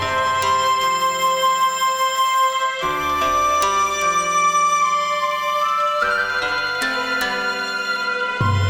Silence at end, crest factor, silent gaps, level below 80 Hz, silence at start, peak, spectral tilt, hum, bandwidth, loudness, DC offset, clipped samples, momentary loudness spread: 0 s; 14 dB; none; -48 dBFS; 0 s; -4 dBFS; -2.5 dB/octave; none; over 20 kHz; -18 LUFS; under 0.1%; under 0.1%; 4 LU